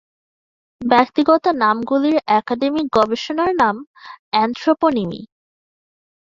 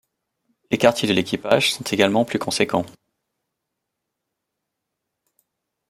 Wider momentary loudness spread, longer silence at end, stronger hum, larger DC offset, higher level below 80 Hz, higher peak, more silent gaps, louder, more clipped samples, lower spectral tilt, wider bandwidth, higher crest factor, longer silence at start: about the same, 8 LU vs 6 LU; second, 1.15 s vs 3 s; neither; neither; first, -56 dBFS vs -62 dBFS; about the same, -2 dBFS vs -2 dBFS; first, 3.87-3.94 s, 4.19-4.32 s vs none; first, -17 LUFS vs -20 LUFS; neither; first, -6 dB/octave vs -4 dB/octave; second, 7.6 kHz vs 16 kHz; second, 16 dB vs 22 dB; about the same, 0.8 s vs 0.7 s